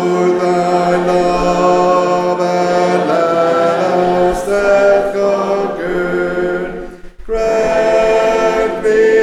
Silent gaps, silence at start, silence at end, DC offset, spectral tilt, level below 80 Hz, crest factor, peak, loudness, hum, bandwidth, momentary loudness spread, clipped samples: none; 0 s; 0 s; 0.1%; -6 dB/octave; -36 dBFS; 12 dB; 0 dBFS; -13 LUFS; none; 12.5 kHz; 6 LU; under 0.1%